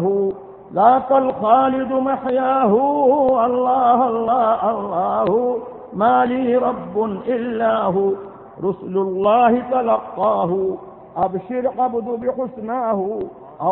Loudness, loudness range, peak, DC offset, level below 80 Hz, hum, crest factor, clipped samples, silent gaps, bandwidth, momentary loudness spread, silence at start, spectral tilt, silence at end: -18 LUFS; 5 LU; 0 dBFS; under 0.1%; -56 dBFS; none; 18 dB; under 0.1%; none; 4.1 kHz; 10 LU; 0 s; -11.5 dB/octave; 0 s